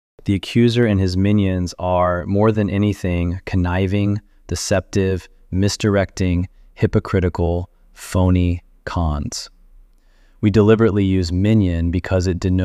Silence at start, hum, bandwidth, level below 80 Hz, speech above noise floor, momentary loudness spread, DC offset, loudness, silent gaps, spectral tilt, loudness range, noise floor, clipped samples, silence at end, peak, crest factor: 0.25 s; none; 12.5 kHz; -34 dBFS; 34 dB; 11 LU; under 0.1%; -19 LUFS; none; -6.5 dB/octave; 3 LU; -51 dBFS; under 0.1%; 0 s; -2 dBFS; 16 dB